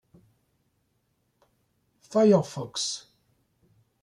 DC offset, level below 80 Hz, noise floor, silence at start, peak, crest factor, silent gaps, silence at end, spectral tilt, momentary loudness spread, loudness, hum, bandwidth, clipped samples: under 0.1%; -72 dBFS; -73 dBFS; 2.1 s; -8 dBFS; 22 dB; none; 1.05 s; -5 dB/octave; 12 LU; -25 LUFS; none; 12 kHz; under 0.1%